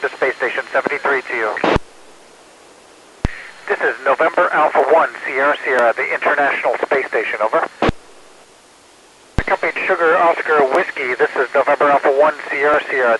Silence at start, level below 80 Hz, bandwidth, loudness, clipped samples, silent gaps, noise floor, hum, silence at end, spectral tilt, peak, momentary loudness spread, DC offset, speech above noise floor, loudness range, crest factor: 0 s; -36 dBFS; 12 kHz; -16 LUFS; under 0.1%; none; -47 dBFS; none; 0 s; -5.5 dB/octave; 0 dBFS; 7 LU; under 0.1%; 31 dB; 5 LU; 16 dB